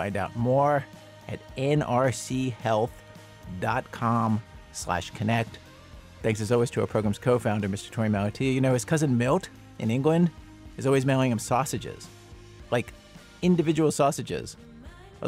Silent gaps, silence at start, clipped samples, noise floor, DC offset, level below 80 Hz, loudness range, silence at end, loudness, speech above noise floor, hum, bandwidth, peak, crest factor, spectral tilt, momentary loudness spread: none; 0 s; under 0.1%; -47 dBFS; under 0.1%; -52 dBFS; 3 LU; 0 s; -26 LUFS; 22 dB; none; 16 kHz; -10 dBFS; 16 dB; -6 dB/octave; 17 LU